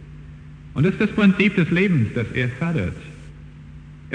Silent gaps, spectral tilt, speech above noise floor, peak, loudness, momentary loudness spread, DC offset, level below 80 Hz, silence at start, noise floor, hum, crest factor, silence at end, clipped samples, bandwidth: none; -8 dB/octave; 21 dB; -4 dBFS; -20 LUFS; 24 LU; under 0.1%; -44 dBFS; 0 s; -40 dBFS; none; 18 dB; 0 s; under 0.1%; 9.6 kHz